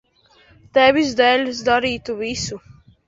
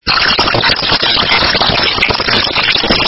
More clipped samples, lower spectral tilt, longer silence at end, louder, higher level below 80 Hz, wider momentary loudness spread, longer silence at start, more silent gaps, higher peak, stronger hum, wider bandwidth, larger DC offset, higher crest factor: second, under 0.1% vs 0.1%; second, -3.5 dB/octave vs -5 dB/octave; first, 0.35 s vs 0 s; second, -18 LUFS vs -9 LUFS; second, -50 dBFS vs -30 dBFS; first, 11 LU vs 2 LU; first, 0.75 s vs 0.05 s; neither; about the same, -2 dBFS vs 0 dBFS; neither; about the same, 7.8 kHz vs 8 kHz; neither; first, 18 dB vs 12 dB